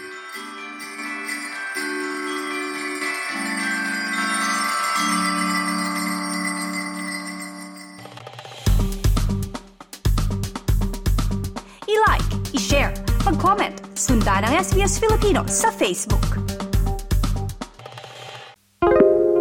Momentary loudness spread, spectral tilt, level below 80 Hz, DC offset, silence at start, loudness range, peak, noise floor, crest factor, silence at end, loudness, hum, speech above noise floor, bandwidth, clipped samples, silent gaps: 16 LU; -4.5 dB/octave; -28 dBFS; under 0.1%; 0 s; 7 LU; -2 dBFS; -42 dBFS; 20 dB; 0 s; -22 LUFS; none; 23 dB; 17.5 kHz; under 0.1%; none